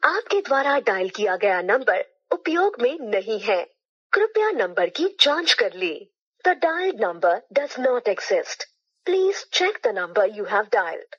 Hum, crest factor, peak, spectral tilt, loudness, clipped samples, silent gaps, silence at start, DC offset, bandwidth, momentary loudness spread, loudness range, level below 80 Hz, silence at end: none; 22 dB; 0 dBFS; -2 dB/octave; -22 LUFS; under 0.1%; 3.85-4.10 s, 6.22-6.32 s; 0 s; under 0.1%; 8.8 kHz; 7 LU; 2 LU; under -90 dBFS; 0.15 s